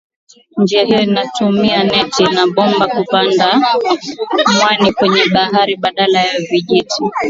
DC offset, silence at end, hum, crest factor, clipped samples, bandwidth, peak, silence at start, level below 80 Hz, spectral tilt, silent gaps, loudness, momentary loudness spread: under 0.1%; 0 s; none; 12 dB; under 0.1%; 7.8 kHz; 0 dBFS; 0.55 s; -52 dBFS; -4.5 dB/octave; none; -12 LUFS; 5 LU